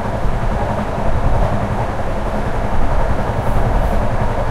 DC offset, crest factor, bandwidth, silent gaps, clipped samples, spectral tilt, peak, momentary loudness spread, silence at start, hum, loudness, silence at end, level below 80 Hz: under 0.1%; 14 dB; 11.5 kHz; none; under 0.1%; -7.5 dB/octave; -2 dBFS; 3 LU; 0 s; none; -20 LUFS; 0 s; -18 dBFS